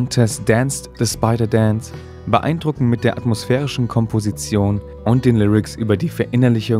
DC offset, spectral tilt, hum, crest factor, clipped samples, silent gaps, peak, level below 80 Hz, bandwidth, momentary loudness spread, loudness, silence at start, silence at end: under 0.1%; -6.5 dB/octave; none; 18 dB; under 0.1%; none; 0 dBFS; -40 dBFS; 15 kHz; 6 LU; -18 LUFS; 0 s; 0 s